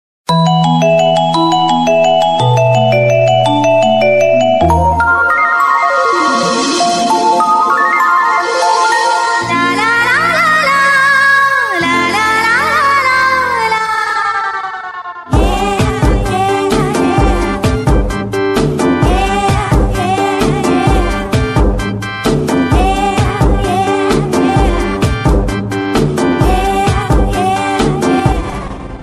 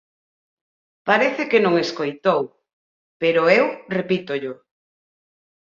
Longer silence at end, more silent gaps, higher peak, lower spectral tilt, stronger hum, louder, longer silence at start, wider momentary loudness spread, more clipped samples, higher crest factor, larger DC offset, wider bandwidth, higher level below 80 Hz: second, 0 s vs 1.1 s; second, none vs 2.73-3.20 s; about the same, 0 dBFS vs -2 dBFS; about the same, -5 dB/octave vs -5.5 dB/octave; neither; first, -11 LUFS vs -20 LUFS; second, 0.3 s vs 1.05 s; second, 5 LU vs 11 LU; neither; second, 10 dB vs 20 dB; neither; first, 14 kHz vs 7.4 kHz; first, -22 dBFS vs -68 dBFS